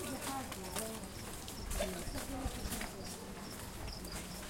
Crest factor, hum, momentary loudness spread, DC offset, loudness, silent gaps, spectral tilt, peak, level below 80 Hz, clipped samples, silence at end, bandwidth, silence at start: 22 dB; none; 6 LU; under 0.1%; -43 LUFS; none; -3.5 dB/octave; -20 dBFS; -50 dBFS; under 0.1%; 0 s; 16.5 kHz; 0 s